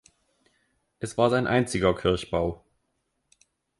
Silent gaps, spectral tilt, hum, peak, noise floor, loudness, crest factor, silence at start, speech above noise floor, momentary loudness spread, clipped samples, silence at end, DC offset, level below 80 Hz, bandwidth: none; -5.5 dB/octave; none; -6 dBFS; -76 dBFS; -25 LUFS; 22 dB; 1 s; 52 dB; 12 LU; under 0.1%; 1.25 s; under 0.1%; -48 dBFS; 11.5 kHz